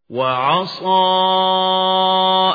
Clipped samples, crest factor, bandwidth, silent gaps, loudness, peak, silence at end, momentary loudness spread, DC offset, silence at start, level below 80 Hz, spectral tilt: under 0.1%; 12 dB; 5 kHz; none; -15 LUFS; -4 dBFS; 0 s; 4 LU; under 0.1%; 0.1 s; -66 dBFS; -6 dB/octave